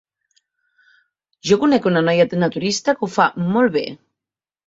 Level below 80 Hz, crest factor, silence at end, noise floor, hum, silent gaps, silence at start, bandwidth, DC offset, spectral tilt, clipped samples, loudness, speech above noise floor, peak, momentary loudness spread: -60 dBFS; 18 dB; 0.7 s; -89 dBFS; none; none; 1.45 s; 8 kHz; under 0.1%; -5.5 dB/octave; under 0.1%; -18 LUFS; 71 dB; -2 dBFS; 6 LU